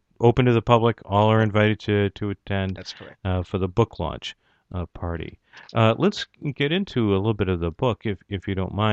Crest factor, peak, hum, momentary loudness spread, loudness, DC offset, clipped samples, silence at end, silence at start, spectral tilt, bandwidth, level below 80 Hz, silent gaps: 22 dB; -2 dBFS; none; 15 LU; -23 LUFS; under 0.1%; under 0.1%; 0 s; 0.2 s; -7.5 dB/octave; 7.6 kHz; -46 dBFS; none